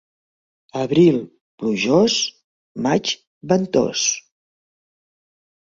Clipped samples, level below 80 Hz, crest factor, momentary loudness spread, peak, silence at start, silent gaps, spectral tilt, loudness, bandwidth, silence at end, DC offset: under 0.1%; -60 dBFS; 18 dB; 14 LU; -2 dBFS; 0.75 s; 1.41-1.58 s, 2.44-2.75 s, 3.27-3.41 s; -4 dB/octave; -19 LUFS; 7.8 kHz; 1.5 s; under 0.1%